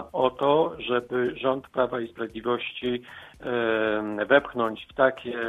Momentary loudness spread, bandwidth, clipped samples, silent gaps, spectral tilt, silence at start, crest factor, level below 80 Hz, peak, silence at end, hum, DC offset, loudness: 10 LU; 7 kHz; under 0.1%; none; -7 dB/octave; 0 s; 22 dB; -60 dBFS; -4 dBFS; 0 s; none; under 0.1%; -26 LUFS